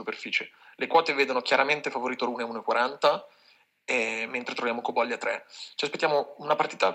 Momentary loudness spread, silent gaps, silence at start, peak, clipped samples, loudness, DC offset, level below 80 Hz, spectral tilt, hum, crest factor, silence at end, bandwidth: 9 LU; none; 0 s; -8 dBFS; under 0.1%; -27 LUFS; under 0.1%; -86 dBFS; -3 dB/octave; none; 20 dB; 0 s; 15.5 kHz